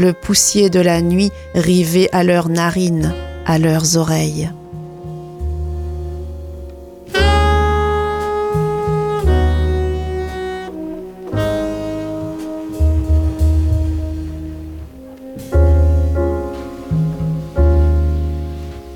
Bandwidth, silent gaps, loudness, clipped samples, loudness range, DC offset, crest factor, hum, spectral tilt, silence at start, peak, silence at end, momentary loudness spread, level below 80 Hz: 15.5 kHz; none; -17 LUFS; under 0.1%; 6 LU; under 0.1%; 14 dB; none; -5.5 dB/octave; 0 s; -2 dBFS; 0 s; 17 LU; -22 dBFS